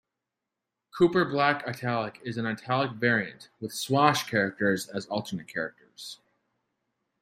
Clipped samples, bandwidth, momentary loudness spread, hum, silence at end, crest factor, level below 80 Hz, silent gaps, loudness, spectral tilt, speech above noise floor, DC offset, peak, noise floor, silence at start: under 0.1%; 15.5 kHz; 18 LU; none; 1.05 s; 24 dB; -70 dBFS; none; -27 LUFS; -5 dB/octave; 59 dB; under 0.1%; -6 dBFS; -86 dBFS; 0.95 s